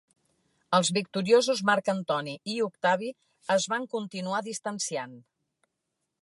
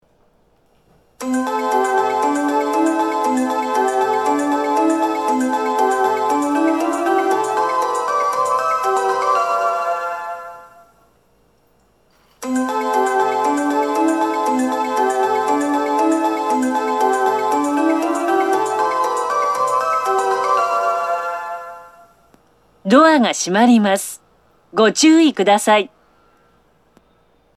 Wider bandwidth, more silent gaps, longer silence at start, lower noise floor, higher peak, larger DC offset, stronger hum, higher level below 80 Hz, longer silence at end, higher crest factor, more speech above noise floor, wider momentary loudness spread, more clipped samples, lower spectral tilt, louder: second, 11.5 kHz vs 14 kHz; neither; second, 0.7 s vs 1.2 s; first, -82 dBFS vs -58 dBFS; second, -8 dBFS vs 0 dBFS; neither; neither; second, -78 dBFS vs -66 dBFS; second, 1 s vs 1.7 s; about the same, 20 dB vs 18 dB; first, 55 dB vs 44 dB; about the same, 11 LU vs 9 LU; neither; about the same, -3.5 dB/octave vs -3.5 dB/octave; second, -28 LUFS vs -17 LUFS